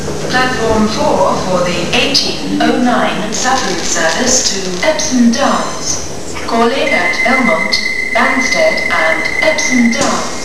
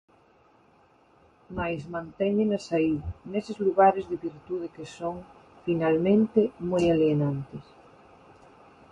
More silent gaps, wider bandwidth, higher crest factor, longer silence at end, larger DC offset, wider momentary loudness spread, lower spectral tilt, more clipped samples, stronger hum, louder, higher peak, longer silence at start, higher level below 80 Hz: neither; first, 12 kHz vs 10.5 kHz; second, 14 dB vs 20 dB; second, 0 s vs 1.3 s; first, 8% vs under 0.1%; second, 5 LU vs 15 LU; second, -2.5 dB/octave vs -8 dB/octave; neither; neither; first, -12 LUFS vs -26 LUFS; first, 0 dBFS vs -8 dBFS; second, 0 s vs 1.5 s; first, -38 dBFS vs -54 dBFS